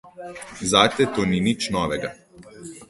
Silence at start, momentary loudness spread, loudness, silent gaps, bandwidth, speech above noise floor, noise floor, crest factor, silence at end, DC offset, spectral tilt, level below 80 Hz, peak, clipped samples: 0.05 s; 21 LU; -21 LUFS; none; 12 kHz; 20 dB; -42 dBFS; 22 dB; 0.05 s; under 0.1%; -4 dB/octave; -50 dBFS; -2 dBFS; under 0.1%